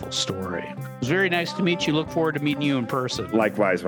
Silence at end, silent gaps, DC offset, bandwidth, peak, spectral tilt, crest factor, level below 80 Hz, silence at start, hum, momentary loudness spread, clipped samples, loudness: 0 s; none; under 0.1%; over 20 kHz; -8 dBFS; -5 dB/octave; 16 dB; -56 dBFS; 0 s; none; 9 LU; under 0.1%; -24 LUFS